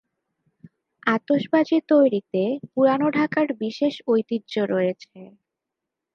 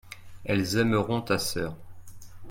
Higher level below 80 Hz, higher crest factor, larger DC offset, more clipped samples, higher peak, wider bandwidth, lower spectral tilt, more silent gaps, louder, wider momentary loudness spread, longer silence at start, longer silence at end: second, -76 dBFS vs -52 dBFS; about the same, 20 dB vs 18 dB; neither; neither; first, -4 dBFS vs -10 dBFS; second, 6.8 kHz vs 16.5 kHz; first, -7 dB/octave vs -5 dB/octave; neither; first, -22 LUFS vs -27 LUFS; second, 7 LU vs 17 LU; first, 1.05 s vs 0.05 s; first, 0.9 s vs 0 s